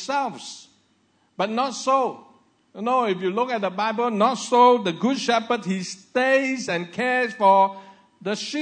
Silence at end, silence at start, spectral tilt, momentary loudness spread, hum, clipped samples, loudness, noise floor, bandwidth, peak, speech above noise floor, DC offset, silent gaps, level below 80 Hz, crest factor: 0 s; 0 s; -4 dB/octave; 13 LU; none; under 0.1%; -22 LUFS; -64 dBFS; 9.6 kHz; -4 dBFS; 42 dB; under 0.1%; none; -78 dBFS; 20 dB